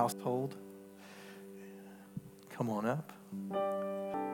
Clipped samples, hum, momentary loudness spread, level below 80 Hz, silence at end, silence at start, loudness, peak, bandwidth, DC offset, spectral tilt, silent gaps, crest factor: under 0.1%; none; 17 LU; -80 dBFS; 0 s; 0 s; -38 LUFS; -16 dBFS; 18 kHz; under 0.1%; -6.5 dB/octave; none; 22 dB